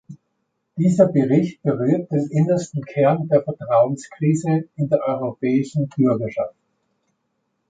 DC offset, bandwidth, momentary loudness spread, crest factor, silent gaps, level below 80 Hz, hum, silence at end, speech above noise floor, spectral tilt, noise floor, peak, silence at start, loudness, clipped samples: under 0.1%; 9.2 kHz; 8 LU; 18 dB; none; -62 dBFS; none; 1.2 s; 54 dB; -8.5 dB/octave; -73 dBFS; -2 dBFS; 0.1 s; -20 LUFS; under 0.1%